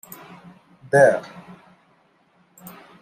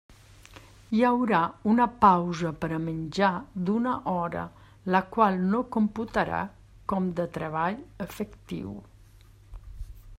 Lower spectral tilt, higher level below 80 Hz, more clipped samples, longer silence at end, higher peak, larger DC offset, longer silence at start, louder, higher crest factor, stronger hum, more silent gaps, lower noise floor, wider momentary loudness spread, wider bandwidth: about the same, -6 dB/octave vs -7 dB/octave; second, -70 dBFS vs -52 dBFS; neither; first, 1.8 s vs 0 s; first, -2 dBFS vs -6 dBFS; neither; first, 0.95 s vs 0.5 s; first, -18 LUFS vs -27 LUFS; about the same, 22 dB vs 22 dB; neither; neither; first, -60 dBFS vs -53 dBFS; first, 27 LU vs 16 LU; about the same, 16 kHz vs 16 kHz